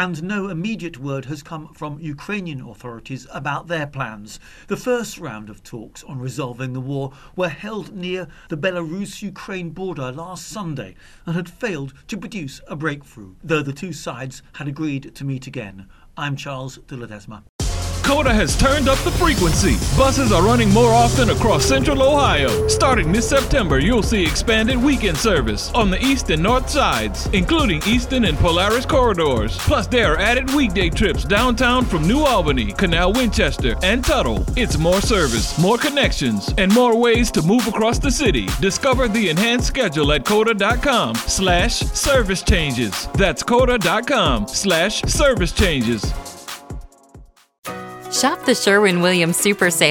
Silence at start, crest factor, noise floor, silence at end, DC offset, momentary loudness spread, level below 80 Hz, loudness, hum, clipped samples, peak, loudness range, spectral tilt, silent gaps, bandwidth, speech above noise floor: 0 s; 18 dB; -45 dBFS; 0 s; under 0.1%; 16 LU; -28 dBFS; -18 LUFS; none; under 0.1%; 0 dBFS; 13 LU; -4.5 dB/octave; 17.49-17.59 s, 47.59-47.63 s; 19.5 kHz; 27 dB